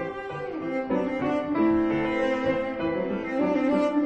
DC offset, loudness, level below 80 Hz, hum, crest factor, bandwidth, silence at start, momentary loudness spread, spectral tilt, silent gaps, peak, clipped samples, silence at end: under 0.1%; -26 LUFS; -54 dBFS; none; 14 dB; 8.2 kHz; 0 s; 8 LU; -7.5 dB/octave; none; -12 dBFS; under 0.1%; 0 s